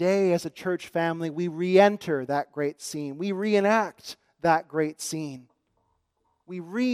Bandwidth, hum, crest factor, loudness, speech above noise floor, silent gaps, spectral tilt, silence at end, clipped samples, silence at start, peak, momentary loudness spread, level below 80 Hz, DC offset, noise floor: 15.5 kHz; none; 20 dB; -26 LUFS; 48 dB; none; -5.5 dB/octave; 0 s; under 0.1%; 0 s; -6 dBFS; 14 LU; -72 dBFS; under 0.1%; -73 dBFS